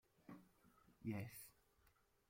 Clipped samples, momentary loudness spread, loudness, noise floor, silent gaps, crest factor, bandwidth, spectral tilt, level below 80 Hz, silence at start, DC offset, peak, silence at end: under 0.1%; 14 LU; -54 LUFS; -78 dBFS; none; 20 dB; 16.5 kHz; -6 dB/octave; -80 dBFS; 0.2 s; under 0.1%; -36 dBFS; 0.4 s